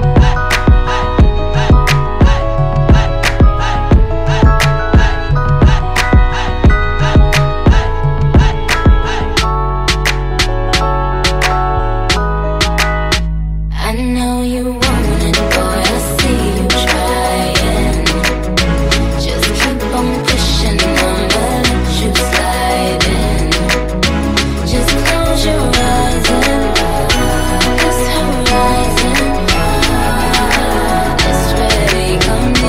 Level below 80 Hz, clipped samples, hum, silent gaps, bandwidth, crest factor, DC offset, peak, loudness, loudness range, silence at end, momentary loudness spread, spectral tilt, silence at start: -14 dBFS; under 0.1%; none; none; 16 kHz; 12 dB; 2%; 0 dBFS; -13 LUFS; 2 LU; 0 s; 4 LU; -4.5 dB/octave; 0 s